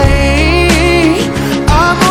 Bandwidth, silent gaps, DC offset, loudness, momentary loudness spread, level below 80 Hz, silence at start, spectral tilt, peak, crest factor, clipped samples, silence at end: 17 kHz; none; under 0.1%; -10 LUFS; 5 LU; -16 dBFS; 0 s; -5 dB/octave; 0 dBFS; 8 dB; 0.7%; 0 s